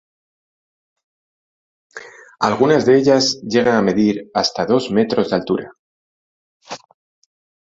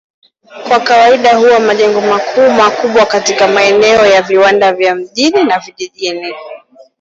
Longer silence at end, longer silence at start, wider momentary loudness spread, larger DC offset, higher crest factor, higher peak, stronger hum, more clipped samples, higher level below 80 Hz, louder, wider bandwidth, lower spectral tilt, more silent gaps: first, 1 s vs 0.45 s; first, 1.95 s vs 0.5 s; first, 22 LU vs 11 LU; neither; first, 18 dB vs 10 dB; about the same, -2 dBFS vs 0 dBFS; neither; neither; about the same, -56 dBFS vs -52 dBFS; second, -16 LUFS vs -9 LUFS; about the same, 7.8 kHz vs 8 kHz; first, -5 dB/octave vs -3 dB/octave; first, 5.79-6.60 s vs none